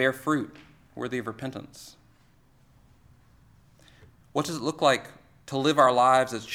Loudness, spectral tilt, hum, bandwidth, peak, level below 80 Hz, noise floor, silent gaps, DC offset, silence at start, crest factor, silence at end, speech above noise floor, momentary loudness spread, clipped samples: -25 LUFS; -4.5 dB/octave; none; 17.5 kHz; -6 dBFS; -64 dBFS; -60 dBFS; none; under 0.1%; 0 s; 22 dB; 0 s; 34 dB; 21 LU; under 0.1%